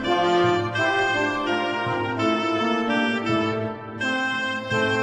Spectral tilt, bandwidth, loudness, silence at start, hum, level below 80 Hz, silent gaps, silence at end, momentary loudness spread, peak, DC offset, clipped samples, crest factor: -5 dB/octave; 9.8 kHz; -23 LUFS; 0 s; none; -56 dBFS; none; 0 s; 5 LU; -8 dBFS; under 0.1%; under 0.1%; 14 dB